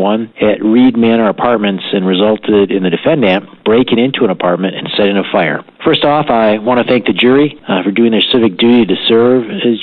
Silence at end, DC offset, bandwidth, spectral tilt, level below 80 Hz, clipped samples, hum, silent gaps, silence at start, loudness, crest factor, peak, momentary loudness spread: 0 s; under 0.1%; 4.7 kHz; -9 dB/octave; -48 dBFS; under 0.1%; none; none; 0 s; -11 LUFS; 10 dB; 0 dBFS; 5 LU